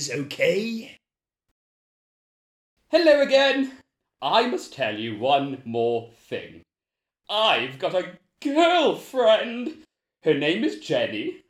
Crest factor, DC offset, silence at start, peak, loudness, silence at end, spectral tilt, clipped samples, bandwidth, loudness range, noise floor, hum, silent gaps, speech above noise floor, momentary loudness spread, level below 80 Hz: 20 dB; under 0.1%; 0 s; -4 dBFS; -23 LUFS; 0.1 s; -4 dB/octave; under 0.1%; 15 kHz; 4 LU; -89 dBFS; none; 1.51-2.77 s; 66 dB; 14 LU; -70 dBFS